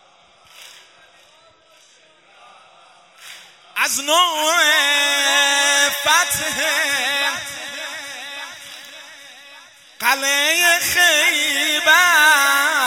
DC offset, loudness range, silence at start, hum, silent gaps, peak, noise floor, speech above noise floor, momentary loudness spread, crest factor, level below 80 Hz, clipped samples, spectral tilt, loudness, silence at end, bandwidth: under 0.1%; 10 LU; 0.6 s; none; none; 0 dBFS; -52 dBFS; 36 dB; 17 LU; 20 dB; -62 dBFS; under 0.1%; 1 dB/octave; -15 LUFS; 0 s; 16.5 kHz